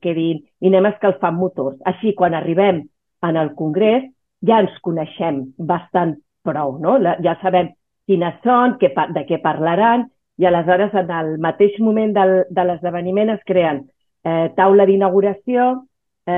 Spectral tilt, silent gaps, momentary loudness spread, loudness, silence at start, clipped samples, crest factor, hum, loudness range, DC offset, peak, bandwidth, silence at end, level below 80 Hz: -10 dB/octave; none; 8 LU; -17 LUFS; 0.05 s; under 0.1%; 14 dB; none; 3 LU; under 0.1%; -2 dBFS; 3.8 kHz; 0 s; -62 dBFS